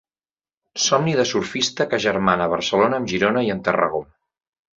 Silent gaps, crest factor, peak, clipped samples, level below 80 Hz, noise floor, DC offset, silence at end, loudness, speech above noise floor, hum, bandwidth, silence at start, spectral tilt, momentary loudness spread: none; 20 dB; -2 dBFS; under 0.1%; -54 dBFS; under -90 dBFS; under 0.1%; 0.75 s; -20 LUFS; over 70 dB; none; 8 kHz; 0.75 s; -4 dB/octave; 4 LU